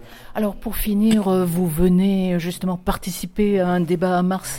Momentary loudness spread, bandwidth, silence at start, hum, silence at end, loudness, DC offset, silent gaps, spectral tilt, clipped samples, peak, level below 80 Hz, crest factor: 8 LU; 17 kHz; 0 s; none; 0 s; -20 LUFS; under 0.1%; none; -6.5 dB/octave; under 0.1%; -6 dBFS; -36 dBFS; 14 dB